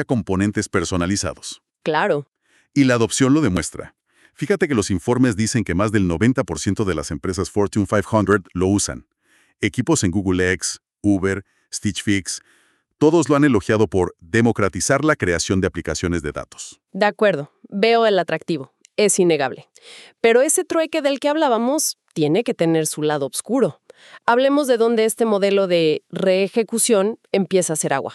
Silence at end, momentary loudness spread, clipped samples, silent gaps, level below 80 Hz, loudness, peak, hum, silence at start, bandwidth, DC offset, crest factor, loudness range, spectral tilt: 0 s; 9 LU; under 0.1%; 2.28-2.32 s; -46 dBFS; -19 LUFS; -4 dBFS; none; 0 s; 13.5 kHz; under 0.1%; 16 dB; 3 LU; -4.5 dB/octave